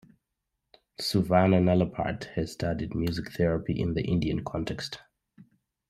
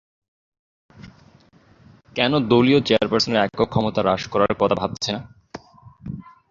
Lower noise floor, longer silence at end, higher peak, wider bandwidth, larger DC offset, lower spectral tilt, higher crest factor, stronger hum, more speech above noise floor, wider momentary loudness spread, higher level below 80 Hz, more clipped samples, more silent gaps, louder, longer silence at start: first, -83 dBFS vs -53 dBFS; first, 0.45 s vs 0.3 s; second, -8 dBFS vs -2 dBFS; first, 14.5 kHz vs 7.6 kHz; neither; first, -7 dB/octave vs -5.5 dB/octave; about the same, 20 dB vs 20 dB; neither; first, 56 dB vs 34 dB; second, 11 LU vs 23 LU; about the same, -50 dBFS vs -50 dBFS; neither; neither; second, -28 LUFS vs -20 LUFS; about the same, 1 s vs 1 s